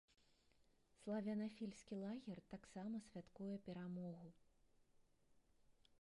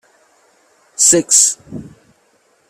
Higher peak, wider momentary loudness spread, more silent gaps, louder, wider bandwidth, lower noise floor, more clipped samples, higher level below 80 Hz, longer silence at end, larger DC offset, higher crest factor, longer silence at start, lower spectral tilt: second, -36 dBFS vs 0 dBFS; second, 11 LU vs 24 LU; neither; second, -51 LUFS vs -10 LUFS; second, 11 kHz vs over 20 kHz; first, -77 dBFS vs -57 dBFS; neither; second, -80 dBFS vs -58 dBFS; second, 0.3 s vs 0.85 s; neither; about the same, 18 dB vs 18 dB; second, 0.6 s vs 1 s; first, -7 dB/octave vs -1.5 dB/octave